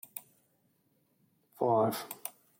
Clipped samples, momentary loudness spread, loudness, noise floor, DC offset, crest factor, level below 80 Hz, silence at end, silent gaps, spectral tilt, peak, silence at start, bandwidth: under 0.1%; 17 LU; -32 LUFS; -73 dBFS; under 0.1%; 20 dB; -80 dBFS; 0.3 s; none; -5.5 dB/octave; -16 dBFS; 0.15 s; 17 kHz